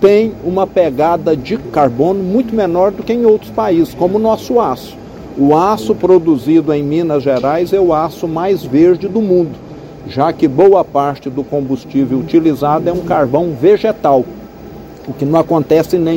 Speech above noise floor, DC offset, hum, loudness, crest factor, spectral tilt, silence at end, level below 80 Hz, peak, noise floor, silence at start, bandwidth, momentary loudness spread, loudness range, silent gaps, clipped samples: 20 dB; under 0.1%; none; -13 LUFS; 12 dB; -8 dB/octave; 0 s; -42 dBFS; 0 dBFS; -31 dBFS; 0 s; 16.5 kHz; 11 LU; 1 LU; none; 0.2%